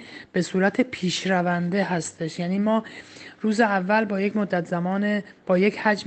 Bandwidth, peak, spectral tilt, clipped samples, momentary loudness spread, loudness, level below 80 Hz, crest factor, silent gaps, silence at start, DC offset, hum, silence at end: 8.8 kHz; -6 dBFS; -5.5 dB/octave; under 0.1%; 8 LU; -24 LUFS; -66 dBFS; 18 dB; none; 0 s; under 0.1%; none; 0 s